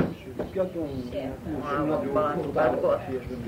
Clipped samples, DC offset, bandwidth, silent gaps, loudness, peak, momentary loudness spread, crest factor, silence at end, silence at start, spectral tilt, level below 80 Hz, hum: under 0.1%; under 0.1%; 16 kHz; none; -28 LUFS; -10 dBFS; 9 LU; 18 dB; 0 s; 0 s; -8 dB/octave; -48 dBFS; none